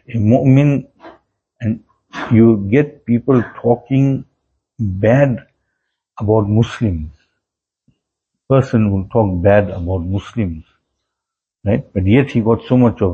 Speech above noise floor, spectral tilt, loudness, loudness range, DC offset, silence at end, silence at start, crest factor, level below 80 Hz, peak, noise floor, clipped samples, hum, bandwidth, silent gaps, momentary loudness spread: 68 dB; -9.5 dB/octave; -15 LUFS; 3 LU; under 0.1%; 0 s; 0.1 s; 16 dB; -40 dBFS; 0 dBFS; -82 dBFS; under 0.1%; none; 7.4 kHz; none; 13 LU